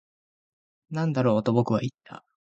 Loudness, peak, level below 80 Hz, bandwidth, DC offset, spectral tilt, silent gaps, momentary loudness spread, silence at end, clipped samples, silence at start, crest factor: -26 LUFS; -8 dBFS; -64 dBFS; 7.8 kHz; under 0.1%; -8.5 dB/octave; none; 11 LU; 0.25 s; under 0.1%; 0.9 s; 20 dB